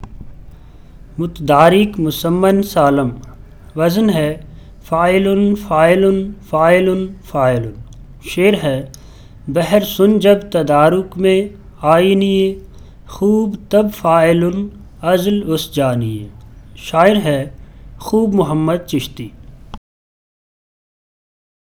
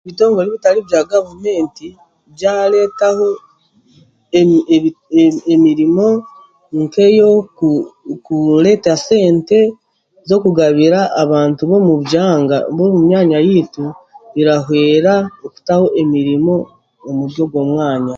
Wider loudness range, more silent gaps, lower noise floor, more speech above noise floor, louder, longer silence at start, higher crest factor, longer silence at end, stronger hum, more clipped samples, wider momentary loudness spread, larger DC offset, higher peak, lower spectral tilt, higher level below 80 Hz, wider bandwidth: about the same, 4 LU vs 3 LU; neither; second, -37 dBFS vs -52 dBFS; second, 24 dB vs 40 dB; about the same, -14 LUFS vs -13 LUFS; about the same, 0 s vs 0.05 s; about the same, 16 dB vs 12 dB; first, 1.95 s vs 0 s; neither; neither; first, 16 LU vs 10 LU; neither; about the same, 0 dBFS vs 0 dBFS; about the same, -6.5 dB/octave vs -7 dB/octave; first, -40 dBFS vs -56 dBFS; first, 19 kHz vs 7.6 kHz